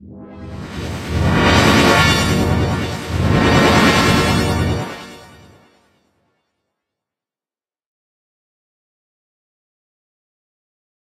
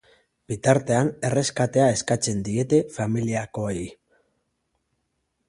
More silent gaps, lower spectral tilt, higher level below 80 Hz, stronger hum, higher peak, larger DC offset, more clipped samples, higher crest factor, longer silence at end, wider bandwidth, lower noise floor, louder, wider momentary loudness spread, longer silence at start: neither; about the same, -5 dB/octave vs -5.5 dB/octave; first, -32 dBFS vs -54 dBFS; neither; about the same, 0 dBFS vs -2 dBFS; neither; neither; about the same, 18 dB vs 22 dB; first, 5.9 s vs 1.55 s; first, 16 kHz vs 11.5 kHz; first, under -90 dBFS vs -75 dBFS; first, -14 LUFS vs -23 LUFS; first, 18 LU vs 9 LU; second, 0.05 s vs 0.5 s